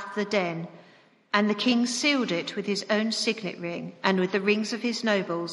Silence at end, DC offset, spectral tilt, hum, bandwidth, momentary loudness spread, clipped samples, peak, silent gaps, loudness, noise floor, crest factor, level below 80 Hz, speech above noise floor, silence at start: 0 s; under 0.1%; -4 dB/octave; none; 11.5 kHz; 9 LU; under 0.1%; -6 dBFS; none; -26 LUFS; -57 dBFS; 22 dB; -78 dBFS; 31 dB; 0 s